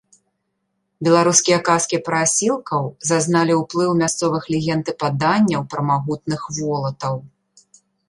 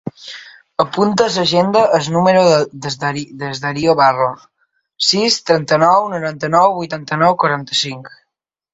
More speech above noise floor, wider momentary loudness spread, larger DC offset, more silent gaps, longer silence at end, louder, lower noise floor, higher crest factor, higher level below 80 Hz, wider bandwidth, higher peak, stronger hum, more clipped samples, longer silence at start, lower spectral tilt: second, 54 dB vs 61 dB; second, 9 LU vs 12 LU; neither; neither; first, 0.8 s vs 0.65 s; second, -19 LUFS vs -15 LUFS; about the same, -73 dBFS vs -76 dBFS; about the same, 18 dB vs 16 dB; about the same, -58 dBFS vs -56 dBFS; first, 11.5 kHz vs 8.2 kHz; about the same, 0 dBFS vs 0 dBFS; neither; neither; first, 1 s vs 0.05 s; about the same, -4 dB/octave vs -4.5 dB/octave